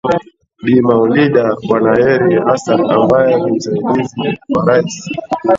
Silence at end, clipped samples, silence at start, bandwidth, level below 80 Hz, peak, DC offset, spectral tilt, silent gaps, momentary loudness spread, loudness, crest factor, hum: 0 s; under 0.1%; 0.05 s; 7.8 kHz; -48 dBFS; 0 dBFS; under 0.1%; -6.5 dB/octave; none; 8 LU; -13 LUFS; 12 dB; none